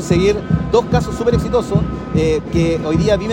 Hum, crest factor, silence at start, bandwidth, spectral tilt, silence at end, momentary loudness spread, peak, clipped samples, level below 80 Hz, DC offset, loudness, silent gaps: none; 14 dB; 0 s; 15.5 kHz; -7 dB/octave; 0 s; 3 LU; 0 dBFS; under 0.1%; -28 dBFS; under 0.1%; -16 LUFS; none